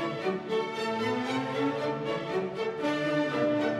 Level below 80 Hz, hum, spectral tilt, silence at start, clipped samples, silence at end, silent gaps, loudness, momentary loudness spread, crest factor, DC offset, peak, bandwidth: -70 dBFS; none; -6 dB/octave; 0 s; under 0.1%; 0 s; none; -30 LUFS; 4 LU; 14 dB; under 0.1%; -16 dBFS; 12.5 kHz